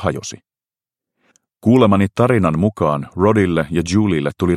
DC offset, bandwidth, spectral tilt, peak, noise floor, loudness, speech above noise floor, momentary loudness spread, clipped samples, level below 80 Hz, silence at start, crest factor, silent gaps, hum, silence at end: under 0.1%; 13 kHz; -7 dB/octave; 0 dBFS; under -90 dBFS; -16 LUFS; over 75 dB; 8 LU; under 0.1%; -44 dBFS; 0 s; 16 dB; none; none; 0 s